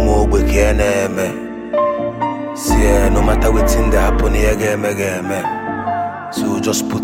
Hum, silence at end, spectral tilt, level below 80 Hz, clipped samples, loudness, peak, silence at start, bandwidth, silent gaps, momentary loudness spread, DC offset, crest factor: none; 0 s; -5.5 dB/octave; -20 dBFS; under 0.1%; -16 LUFS; 0 dBFS; 0 s; 16.5 kHz; none; 8 LU; under 0.1%; 14 dB